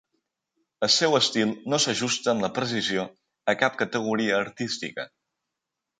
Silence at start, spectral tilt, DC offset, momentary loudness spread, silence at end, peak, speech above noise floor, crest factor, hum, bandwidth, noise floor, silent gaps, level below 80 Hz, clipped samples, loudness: 0.8 s; -3 dB/octave; under 0.1%; 10 LU; 0.9 s; -6 dBFS; 60 dB; 20 dB; none; 9.6 kHz; -85 dBFS; none; -68 dBFS; under 0.1%; -25 LUFS